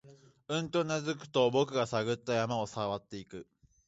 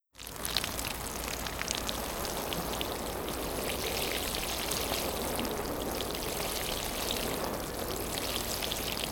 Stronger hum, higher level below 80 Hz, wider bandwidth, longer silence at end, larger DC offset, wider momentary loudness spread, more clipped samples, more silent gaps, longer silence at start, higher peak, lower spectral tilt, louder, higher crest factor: neither; second, -68 dBFS vs -46 dBFS; second, 8 kHz vs 18.5 kHz; first, 0.45 s vs 0 s; neither; first, 16 LU vs 4 LU; neither; neither; about the same, 0.05 s vs 0.15 s; second, -14 dBFS vs -6 dBFS; first, -5 dB/octave vs -2.5 dB/octave; about the same, -32 LUFS vs -33 LUFS; second, 18 dB vs 28 dB